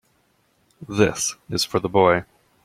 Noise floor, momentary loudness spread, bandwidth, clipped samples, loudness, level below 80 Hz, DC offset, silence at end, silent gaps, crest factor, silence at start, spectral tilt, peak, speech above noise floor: -64 dBFS; 8 LU; 16 kHz; under 0.1%; -21 LUFS; -54 dBFS; under 0.1%; 0.4 s; none; 20 dB; 0.8 s; -4 dB/octave; -2 dBFS; 44 dB